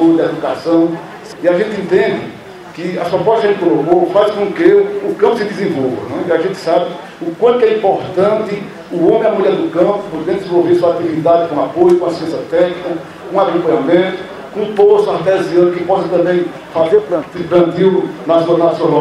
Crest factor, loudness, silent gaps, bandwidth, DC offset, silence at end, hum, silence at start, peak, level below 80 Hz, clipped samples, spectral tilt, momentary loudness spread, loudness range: 12 dB; -13 LUFS; none; 11.5 kHz; under 0.1%; 0 s; none; 0 s; 0 dBFS; -54 dBFS; under 0.1%; -7 dB/octave; 11 LU; 2 LU